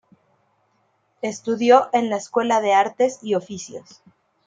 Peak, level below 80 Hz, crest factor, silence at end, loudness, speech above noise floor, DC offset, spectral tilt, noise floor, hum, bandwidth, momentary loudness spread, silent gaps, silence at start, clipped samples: -2 dBFS; -72 dBFS; 20 dB; 0.65 s; -20 LUFS; 46 dB; under 0.1%; -4 dB/octave; -66 dBFS; none; 9.2 kHz; 18 LU; none; 1.25 s; under 0.1%